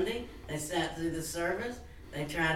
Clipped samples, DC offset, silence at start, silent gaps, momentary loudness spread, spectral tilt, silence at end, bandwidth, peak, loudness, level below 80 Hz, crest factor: under 0.1%; under 0.1%; 0 s; none; 8 LU; -4 dB/octave; 0 s; 17.5 kHz; -18 dBFS; -35 LUFS; -52 dBFS; 16 dB